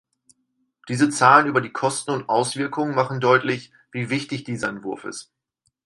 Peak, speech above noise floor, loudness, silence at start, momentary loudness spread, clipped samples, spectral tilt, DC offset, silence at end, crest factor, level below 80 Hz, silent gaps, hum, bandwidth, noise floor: 0 dBFS; 52 dB; -21 LUFS; 0.85 s; 17 LU; under 0.1%; -4.5 dB/octave; under 0.1%; 0.65 s; 22 dB; -66 dBFS; none; none; 11.5 kHz; -73 dBFS